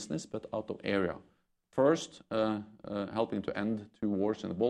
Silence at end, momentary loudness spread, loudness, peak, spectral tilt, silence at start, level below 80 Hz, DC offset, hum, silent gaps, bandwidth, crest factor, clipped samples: 0 s; 10 LU; -34 LUFS; -14 dBFS; -6 dB/octave; 0 s; -68 dBFS; under 0.1%; none; none; 10.5 kHz; 18 dB; under 0.1%